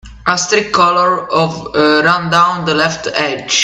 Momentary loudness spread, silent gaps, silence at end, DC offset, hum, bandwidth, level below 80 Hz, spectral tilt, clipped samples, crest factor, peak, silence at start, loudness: 6 LU; none; 0 s; under 0.1%; none; 11.5 kHz; -44 dBFS; -3 dB/octave; under 0.1%; 14 dB; 0 dBFS; 0.05 s; -12 LUFS